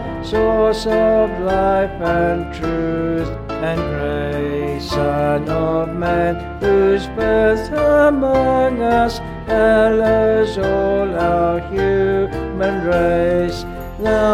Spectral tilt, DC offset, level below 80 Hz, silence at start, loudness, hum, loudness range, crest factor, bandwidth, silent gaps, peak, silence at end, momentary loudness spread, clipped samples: -7 dB/octave; under 0.1%; -32 dBFS; 0 s; -17 LUFS; none; 5 LU; 14 dB; 14.5 kHz; none; -2 dBFS; 0 s; 7 LU; under 0.1%